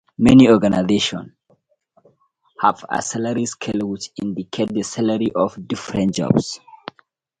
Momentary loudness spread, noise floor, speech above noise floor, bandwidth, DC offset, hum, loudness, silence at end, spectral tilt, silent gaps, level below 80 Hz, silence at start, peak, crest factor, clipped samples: 16 LU; -61 dBFS; 43 dB; 11 kHz; under 0.1%; none; -18 LUFS; 0.85 s; -5.5 dB/octave; none; -48 dBFS; 0.2 s; 0 dBFS; 18 dB; under 0.1%